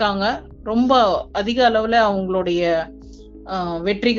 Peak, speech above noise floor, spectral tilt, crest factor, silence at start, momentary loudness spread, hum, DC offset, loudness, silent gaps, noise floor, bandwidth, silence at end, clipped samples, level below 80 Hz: -2 dBFS; 21 dB; -3 dB/octave; 16 dB; 0 s; 10 LU; none; under 0.1%; -19 LUFS; none; -39 dBFS; 7.4 kHz; 0 s; under 0.1%; -42 dBFS